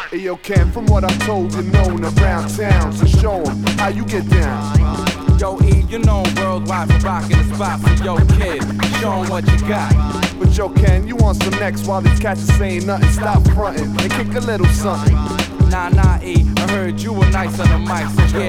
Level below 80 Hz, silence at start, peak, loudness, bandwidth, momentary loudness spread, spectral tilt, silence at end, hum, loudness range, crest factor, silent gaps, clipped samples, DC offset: -18 dBFS; 0 s; 0 dBFS; -16 LUFS; 14.5 kHz; 5 LU; -6.5 dB/octave; 0 s; none; 1 LU; 14 dB; none; under 0.1%; under 0.1%